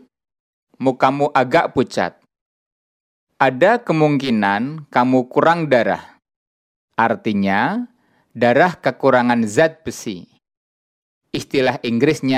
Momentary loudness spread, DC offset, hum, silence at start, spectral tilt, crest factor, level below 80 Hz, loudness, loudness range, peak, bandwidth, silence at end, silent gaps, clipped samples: 12 LU; under 0.1%; none; 0.8 s; -6 dB/octave; 18 dB; -60 dBFS; -17 LUFS; 3 LU; 0 dBFS; 14.5 kHz; 0 s; 2.41-3.27 s, 6.36-6.88 s, 10.57-11.21 s; under 0.1%